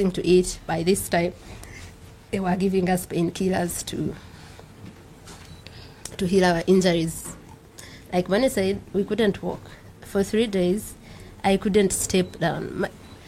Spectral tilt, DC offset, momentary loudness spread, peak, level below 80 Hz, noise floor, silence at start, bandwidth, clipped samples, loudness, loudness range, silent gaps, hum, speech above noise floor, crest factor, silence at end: -5 dB/octave; under 0.1%; 23 LU; -6 dBFS; -46 dBFS; -45 dBFS; 0 s; 16 kHz; under 0.1%; -23 LUFS; 4 LU; none; none; 22 dB; 18 dB; 0.05 s